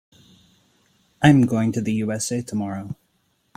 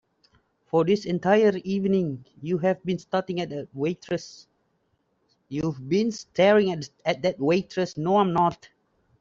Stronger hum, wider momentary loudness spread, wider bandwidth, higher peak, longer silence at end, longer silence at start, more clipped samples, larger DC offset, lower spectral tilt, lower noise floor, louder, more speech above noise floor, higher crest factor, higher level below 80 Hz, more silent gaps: neither; first, 17 LU vs 12 LU; first, 15.5 kHz vs 7.6 kHz; first, -2 dBFS vs -8 dBFS; about the same, 0.65 s vs 0.65 s; first, 1.2 s vs 0.75 s; neither; neither; about the same, -6 dB/octave vs -6.5 dB/octave; second, -67 dBFS vs -71 dBFS; first, -21 LUFS vs -25 LUFS; about the same, 47 dB vs 47 dB; about the same, 22 dB vs 18 dB; first, -54 dBFS vs -62 dBFS; neither